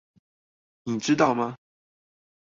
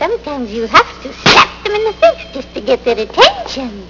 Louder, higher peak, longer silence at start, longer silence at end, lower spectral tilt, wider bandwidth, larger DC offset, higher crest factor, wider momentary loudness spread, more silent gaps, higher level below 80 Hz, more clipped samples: second, -25 LUFS vs -12 LUFS; second, -6 dBFS vs 0 dBFS; first, 0.85 s vs 0 s; first, 1 s vs 0 s; first, -5 dB/octave vs -3 dB/octave; first, 7.8 kHz vs 6 kHz; neither; first, 24 dB vs 14 dB; second, 11 LU vs 14 LU; neither; second, -68 dBFS vs -38 dBFS; second, under 0.1% vs 0.7%